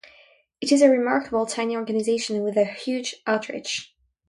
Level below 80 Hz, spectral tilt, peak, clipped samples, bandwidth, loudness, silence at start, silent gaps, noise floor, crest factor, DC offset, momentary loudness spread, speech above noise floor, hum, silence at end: -66 dBFS; -3.5 dB/octave; -4 dBFS; under 0.1%; 11.5 kHz; -23 LUFS; 0.6 s; none; -56 dBFS; 18 dB; under 0.1%; 11 LU; 33 dB; none; 0.45 s